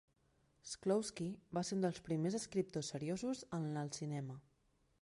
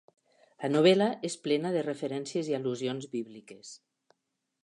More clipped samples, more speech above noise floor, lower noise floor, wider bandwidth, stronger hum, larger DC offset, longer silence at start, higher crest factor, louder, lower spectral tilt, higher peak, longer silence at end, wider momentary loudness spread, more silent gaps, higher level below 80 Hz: neither; second, 36 dB vs 53 dB; second, -77 dBFS vs -83 dBFS; about the same, 11.5 kHz vs 11.5 kHz; neither; neither; about the same, 0.65 s vs 0.6 s; about the same, 18 dB vs 20 dB; second, -42 LUFS vs -29 LUFS; about the same, -5.5 dB/octave vs -5.5 dB/octave; second, -24 dBFS vs -10 dBFS; second, 0.65 s vs 0.9 s; second, 8 LU vs 23 LU; neither; first, -74 dBFS vs -82 dBFS